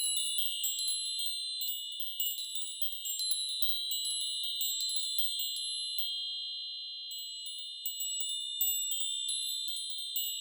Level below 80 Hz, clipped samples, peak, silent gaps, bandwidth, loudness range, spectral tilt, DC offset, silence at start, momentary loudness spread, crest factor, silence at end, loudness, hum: under -90 dBFS; under 0.1%; -16 dBFS; none; over 20 kHz; 3 LU; 10.5 dB/octave; under 0.1%; 0 s; 8 LU; 20 dB; 0 s; -32 LUFS; none